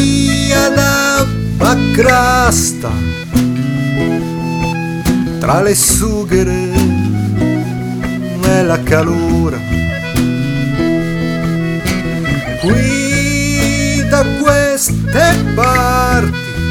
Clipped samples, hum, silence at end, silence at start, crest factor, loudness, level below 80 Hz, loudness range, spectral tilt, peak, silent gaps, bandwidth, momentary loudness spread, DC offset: under 0.1%; none; 0 s; 0 s; 12 dB; -13 LUFS; -26 dBFS; 3 LU; -5 dB/octave; 0 dBFS; none; 19 kHz; 7 LU; under 0.1%